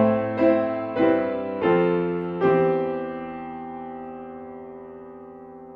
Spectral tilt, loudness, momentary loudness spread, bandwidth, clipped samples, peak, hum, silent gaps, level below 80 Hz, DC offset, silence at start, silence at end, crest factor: -10 dB/octave; -23 LUFS; 20 LU; 5.2 kHz; under 0.1%; -6 dBFS; none; none; -60 dBFS; under 0.1%; 0 s; 0 s; 18 dB